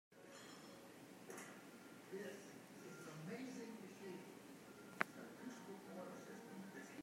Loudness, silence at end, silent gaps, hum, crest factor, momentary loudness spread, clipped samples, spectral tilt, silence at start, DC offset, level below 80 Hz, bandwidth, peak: -54 LUFS; 0 s; none; none; 34 dB; 12 LU; under 0.1%; -4.5 dB/octave; 0.1 s; under 0.1%; under -90 dBFS; 16 kHz; -20 dBFS